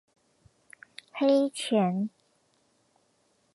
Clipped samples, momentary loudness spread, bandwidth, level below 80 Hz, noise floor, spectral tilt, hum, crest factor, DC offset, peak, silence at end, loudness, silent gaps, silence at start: under 0.1%; 22 LU; 11.5 kHz; -78 dBFS; -70 dBFS; -6 dB/octave; none; 18 dB; under 0.1%; -12 dBFS; 1.45 s; -27 LUFS; none; 1.15 s